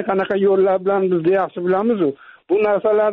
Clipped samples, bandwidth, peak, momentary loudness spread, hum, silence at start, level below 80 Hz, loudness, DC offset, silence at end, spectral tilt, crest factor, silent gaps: under 0.1%; 4.1 kHz; -8 dBFS; 5 LU; none; 0 s; -62 dBFS; -18 LUFS; under 0.1%; 0 s; -6 dB/octave; 10 dB; none